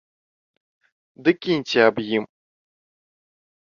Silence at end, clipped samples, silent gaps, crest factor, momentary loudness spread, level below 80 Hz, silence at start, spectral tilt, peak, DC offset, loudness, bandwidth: 1.35 s; under 0.1%; none; 22 dB; 8 LU; -66 dBFS; 1.2 s; -5.5 dB/octave; -4 dBFS; under 0.1%; -21 LUFS; 7.2 kHz